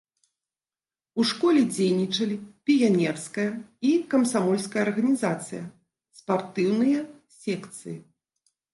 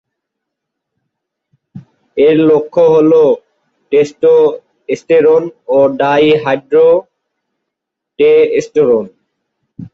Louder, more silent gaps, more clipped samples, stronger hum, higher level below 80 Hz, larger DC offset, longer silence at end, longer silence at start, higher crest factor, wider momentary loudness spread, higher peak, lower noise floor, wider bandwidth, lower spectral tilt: second, -25 LUFS vs -11 LUFS; neither; neither; neither; second, -74 dBFS vs -56 dBFS; neither; first, 0.75 s vs 0.05 s; second, 1.15 s vs 1.75 s; about the same, 16 dB vs 12 dB; first, 17 LU vs 7 LU; second, -10 dBFS vs -2 dBFS; first, under -90 dBFS vs -78 dBFS; first, 11.5 kHz vs 7.4 kHz; about the same, -5.5 dB/octave vs -6.5 dB/octave